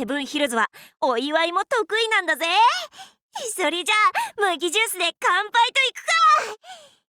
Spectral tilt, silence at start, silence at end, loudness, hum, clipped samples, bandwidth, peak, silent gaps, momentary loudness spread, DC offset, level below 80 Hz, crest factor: -0.5 dB/octave; 0 s; 0.35 s; -20 LUFS; none; under 0.1%; over 20 kHz; -8 dBFS; 3.22-3.29 s; 10 LU; under 0.1%; -74 dBFS; 14 dB